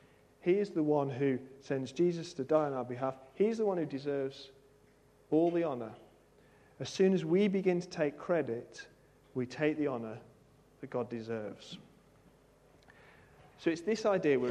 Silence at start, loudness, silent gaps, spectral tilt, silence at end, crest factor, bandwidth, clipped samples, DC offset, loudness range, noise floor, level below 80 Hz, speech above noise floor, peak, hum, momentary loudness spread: 0.45 s; -34 LUFS; none; -7 dB/octave; 0 s; 18 dB; 10 kHz; under 0.1%; under 0.1%; 8 LU; -64 dBFS; -74 dBFS; 32 dB; -16 dBFS; none; 16 LU